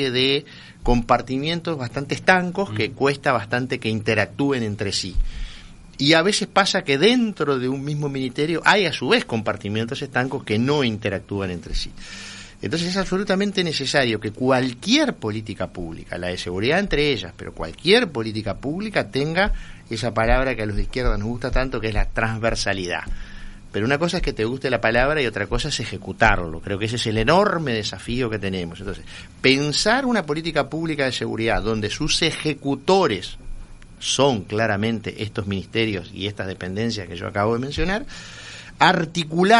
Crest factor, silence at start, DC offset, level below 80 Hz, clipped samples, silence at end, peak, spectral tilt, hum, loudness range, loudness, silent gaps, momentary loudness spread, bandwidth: 22 dB; 0 s; under 0.1%; -34 dBFS; under 0.1%; 0 s; 0 dBFS; -4.5 dB/octave; none; 4 LU; -22 LUFS; none; 13 LU; 11.5 kHz